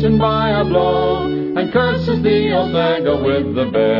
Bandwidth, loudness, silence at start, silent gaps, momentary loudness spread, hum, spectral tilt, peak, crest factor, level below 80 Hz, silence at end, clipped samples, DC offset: 5.8 kHz; -16 LUFS; 0 s; none; 3 LU; none; -9 dB/octave; -4 dBFS; 12 dB; -38 dBFS; 0 s; under 0.1%; under 0.1%